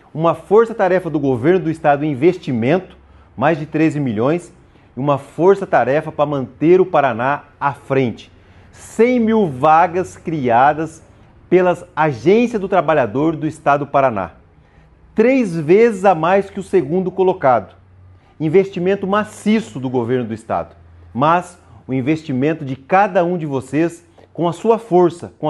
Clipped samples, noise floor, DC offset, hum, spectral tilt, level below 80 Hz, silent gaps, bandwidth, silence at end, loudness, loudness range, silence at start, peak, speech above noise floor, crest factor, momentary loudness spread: under 0.1%; -48 dBFS; under 0.1%; none; -7.5 dB/octave; -52 dBFS; none; 11.5 kHz; 0 s; -16 LUFS; 4 LU; 0.15 s; 0 dBFS; 32 dB; 16 dB; 9 LU